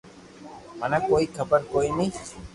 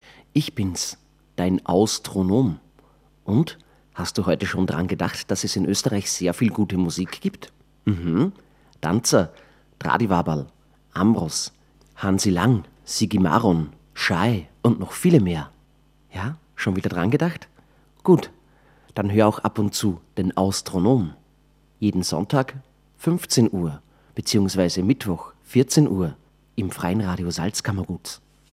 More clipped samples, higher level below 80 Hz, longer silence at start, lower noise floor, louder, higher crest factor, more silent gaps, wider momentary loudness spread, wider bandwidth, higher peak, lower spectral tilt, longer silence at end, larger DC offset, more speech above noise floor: neither; about the same, -50 dBFS vs -50 dBFS; second, 0.05 s vs 0.35 s; second, -45 dBFS vs -58 dBFS; about the same, -25 LUFS vs -23 LUFS; about the same, 20 dB vs 22 dB; neither; first, 21 LU vs 12 LU; second, 11.5 kHz vs 16 kHz; second, -8 dBFS vs 0 dBFS; about the same, -5.5 dB/octave vs -5.5 dB/octave; second, 0.05 s vs 0.35 s; neither; second, 21 dB vs 37 dB